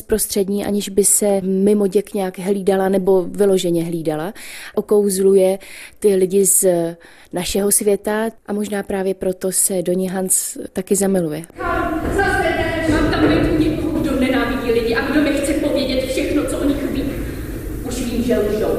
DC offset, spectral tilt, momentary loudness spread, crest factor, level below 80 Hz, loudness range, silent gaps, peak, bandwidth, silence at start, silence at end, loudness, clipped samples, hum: under 0.1%; -4.5 dB/octave; 11 LU; 16 dB; -34 dBFS; 3 LU; none; -2 dBFS; 15.5 kHz; 0 s; 0 s; -18 LUFS; under 0.1%; none